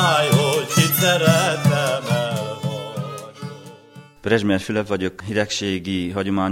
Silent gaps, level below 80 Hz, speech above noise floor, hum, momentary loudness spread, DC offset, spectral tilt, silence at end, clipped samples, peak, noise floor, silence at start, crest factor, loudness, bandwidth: none; -56 dBFS; 23 dB; none; 16 LU; under 0.1%; -4.5 dB/octave; 0 s; under 0.1%; -2 dBFS; -44 dBFS; 0 s; 18 dB; -20 LUFS; 17 kHz